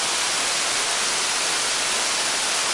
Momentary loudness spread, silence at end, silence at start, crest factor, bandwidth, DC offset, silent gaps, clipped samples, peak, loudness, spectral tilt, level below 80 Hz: 0 LU; 0 s; 0 s; 14 dB; 12 kHz; under 0.1%; none; under 0.1%; -10 dBFS; -20 LUFS; 1.5 dB/octave; -60 dBFS